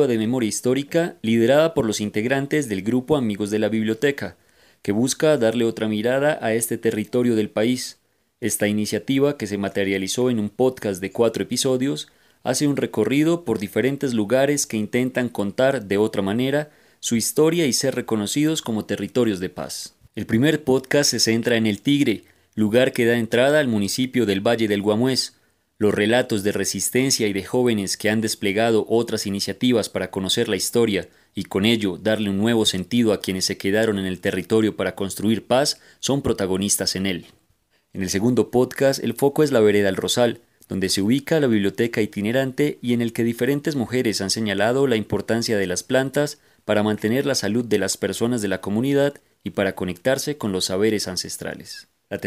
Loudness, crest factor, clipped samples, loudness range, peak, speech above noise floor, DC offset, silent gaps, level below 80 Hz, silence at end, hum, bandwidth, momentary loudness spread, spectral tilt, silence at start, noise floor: -21 LUFS; 20 dB; under 0.1%; 3 LU; -2 dBFS; 44 dB; under 0.1%; none; -58 dBFS; 0 s; none; 16 kHz; 7 LU; -4.5 dB/octave; 0 s; -65 dBFS